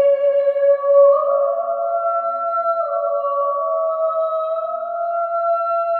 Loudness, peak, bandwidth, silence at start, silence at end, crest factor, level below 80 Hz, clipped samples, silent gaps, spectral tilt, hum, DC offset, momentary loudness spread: -18 LUFS; -4 dBFS; 4.3 kHz; 0 s; 0 s; 14 dB; -76 dBFS; under 0.1%; none; -5 dB/octave; none; under 0.1%; 8 LU